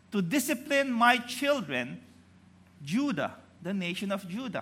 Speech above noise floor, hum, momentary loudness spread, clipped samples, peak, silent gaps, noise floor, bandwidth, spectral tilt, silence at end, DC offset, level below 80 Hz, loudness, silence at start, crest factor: 28 dB; none; 14 LU; under 0.1%; -8 dBFS; none; -58 dBFS; 16 kHz; -4.5 dB/octave; 0 s; under 0.1%; -78 dBFS; -29 LUFS; 0.1 s; 22 dB